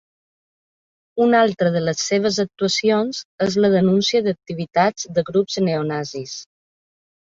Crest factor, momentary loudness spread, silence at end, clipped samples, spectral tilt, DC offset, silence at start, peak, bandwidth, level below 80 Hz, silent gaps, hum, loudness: 18 dB; 11 LU; 0.8 s; under 0.1%; -5 dB/octave; under 0.1%; 1.15 s; -2 dBFS; 7.6 kHz; -60 dBFS; 3.25-3.38 s; none; -19 LUFS